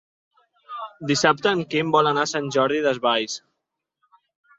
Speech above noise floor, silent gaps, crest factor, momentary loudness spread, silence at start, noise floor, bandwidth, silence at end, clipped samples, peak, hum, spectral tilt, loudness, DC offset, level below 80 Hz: 59 dB; none; 22 dB; 15 LU; 0.7 s; -81 dBFS; 7.8 kHz; 1.2 s; under 0.1%; -2 dBFS; none; -4 dB/octave; -21 LUFS; under 0.1%; -66 dBFS